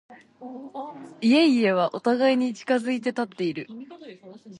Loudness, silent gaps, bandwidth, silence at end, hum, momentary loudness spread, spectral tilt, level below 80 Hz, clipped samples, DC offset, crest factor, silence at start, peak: -23 LUFS; none; 11 kHz; 0.05 s; none; 22 LU; -5.5 dB/octave; -76 dBFS; under 0.1%; under 0.1%; 16 dB; 0.1 s; -8 dBFS